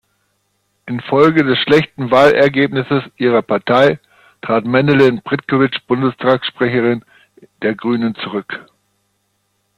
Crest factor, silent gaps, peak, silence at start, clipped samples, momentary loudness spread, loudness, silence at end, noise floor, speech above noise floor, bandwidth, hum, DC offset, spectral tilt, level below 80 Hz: 16 dB; none; 0 dBFS; 0.85 s; under 0.1%; 12 LU; -14 LUFS; 1.2 s; -65 dBFS; 51 dB; 11 kHz; none; under 0.1%; -7 dB/octave; -54 dBFS